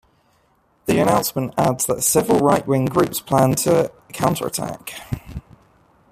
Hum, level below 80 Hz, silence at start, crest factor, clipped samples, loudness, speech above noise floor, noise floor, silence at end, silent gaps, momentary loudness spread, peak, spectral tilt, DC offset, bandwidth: none; -48 dBFS; 0.85 s; 18 dB; under 0.1%; -19 LUFS; 42 dB; -61 dBFS; 0.7 s; none; 14 LU; -2 dBFS; -5 dB/octave; under 0.1%; 15.5 kHz